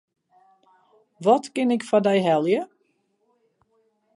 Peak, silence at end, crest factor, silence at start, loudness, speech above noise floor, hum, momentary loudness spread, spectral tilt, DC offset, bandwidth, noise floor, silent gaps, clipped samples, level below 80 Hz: -6 dBFS; 1.5 s; 20 dB; 1.2 s; -22 LUFS; 49 dB; none; 6 LU; -6 dB/octave; under 0.1%; 11.5 kHz; -69 dBFS; none; under 0.1%; -78 dBFS